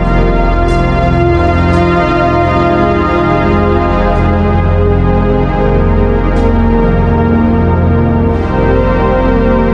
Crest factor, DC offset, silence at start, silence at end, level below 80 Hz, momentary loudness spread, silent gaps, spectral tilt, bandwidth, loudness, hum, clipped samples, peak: 8 dB; under 0.1%; 0 s; 0 s; -16 dBFS; 2 LU; none; -9 dB/octave; 7.4 kHz; -11 LUFS; none; under 0.1%; 0 dBFS